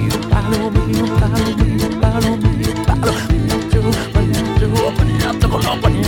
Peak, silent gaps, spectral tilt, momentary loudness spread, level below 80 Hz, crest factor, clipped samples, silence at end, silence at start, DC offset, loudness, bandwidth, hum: -2 dBFS; none; -6 dB/octave; 1 LU; -22 dBFS; 14 dB; under 0.1%; 0 s; 0 s; under 0.1%; -16 LUFS; 18 kHz; none